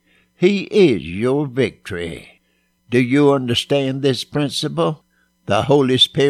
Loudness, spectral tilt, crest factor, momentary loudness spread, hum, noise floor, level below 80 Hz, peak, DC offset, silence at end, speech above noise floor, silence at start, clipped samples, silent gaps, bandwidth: -18 LUFS; -5.5 dB/octave; 18 dB; 13 LU; none; -64 dBFS; -52 dBFS; 0 dBFS; under 0.1%; 0 s; 47 dB; 0.4 s; under 0.1%; none; 14.5 kHz